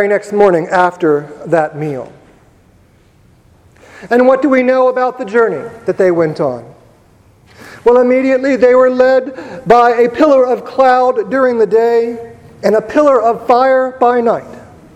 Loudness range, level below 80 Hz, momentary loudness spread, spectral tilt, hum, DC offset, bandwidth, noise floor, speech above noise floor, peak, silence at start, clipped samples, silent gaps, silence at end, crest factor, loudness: 6 LU; -50 dBFS; 10 LU; -6.5 dB/octave; none; under 0.1%; 9.2 kHz; -47 dBFS; 36 dB; 0 dBFS; 0 s; 0.1%; none; 0.3 s; 12 dB; -11 LUFS